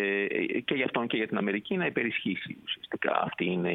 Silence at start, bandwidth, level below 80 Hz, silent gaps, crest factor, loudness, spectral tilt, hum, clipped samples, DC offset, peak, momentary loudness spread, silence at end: 0 s; 4.1 kHz; -72 dBFS; none; 22 dB; -30 LUFS; -8 dB/octave; none; under 0.1%; under 0.1%; -8 dBFS; 6 LU; 0 s